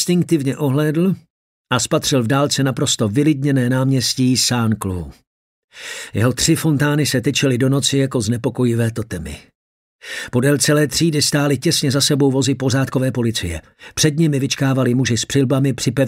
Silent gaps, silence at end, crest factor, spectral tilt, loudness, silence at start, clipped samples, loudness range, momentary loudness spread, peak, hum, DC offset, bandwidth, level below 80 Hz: 1.30-1.65 s, 5.27-5.68 s, 9.55-9.99 s; 0 s; 16 dB; -4.5 dB/octave; -17 LUFS; 0 s; under 0.1%; 3 LU; 12 LU; -2 dBFS; none; under 0.1%; 16 kHz; -46 dBFS